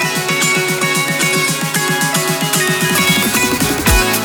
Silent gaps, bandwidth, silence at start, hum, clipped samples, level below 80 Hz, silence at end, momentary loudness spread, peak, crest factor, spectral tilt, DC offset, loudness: none; over 20 kHz; 0 s; none; under 0.1%; -28 dBFS; 0 s; 3 LU; 0 dBFS; 14 dB; -2.5 dB/octave; under 0.1%; -13 LUFS